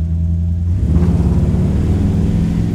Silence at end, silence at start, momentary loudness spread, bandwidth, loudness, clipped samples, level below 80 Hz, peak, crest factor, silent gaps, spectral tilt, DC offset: 0 s; 0 s; 3 LU; 8.8 kHz; -15 LUFS; under 0.1%; -20 dBFS; -2 dBFS; 12 dB; none; -9.5 dB/octave; under 0.1%